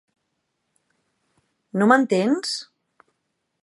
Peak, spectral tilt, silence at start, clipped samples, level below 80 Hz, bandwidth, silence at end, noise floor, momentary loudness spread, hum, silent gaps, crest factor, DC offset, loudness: -2 dBFS; -5 dB/octave; 1.75 s; under 0.1%; -78 dBFS; 11.5 kHz; 1 s; -76 dBFS; 13 LU; none; none; 24 dB; under 0.1%; -21 LUFS